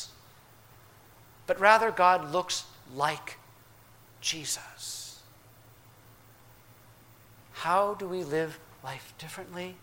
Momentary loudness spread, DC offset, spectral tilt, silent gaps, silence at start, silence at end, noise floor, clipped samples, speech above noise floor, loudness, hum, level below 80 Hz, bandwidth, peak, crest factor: 22 LU; under 0.1%; -2.5 dB/octave; none; 0 s; 0.05 s; -56 dBFS; under 0.1%; 27 dB; -28 LUFS; none; -66 dBFS; 16.5 kHz; -6 dBFS; 26 dB